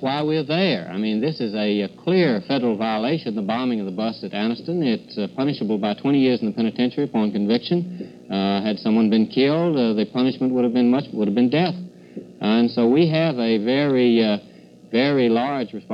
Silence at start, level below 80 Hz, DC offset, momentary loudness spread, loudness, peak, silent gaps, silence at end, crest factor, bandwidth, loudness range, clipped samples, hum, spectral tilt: 0 s; -68 dBFS; under 0.1%; 7 LU; -21 LUFS; -6 dBFS; none; 0 s; 16 dB; 5.8 kHz; 3 LU; under 0.1%; none; -8.5 dB/octave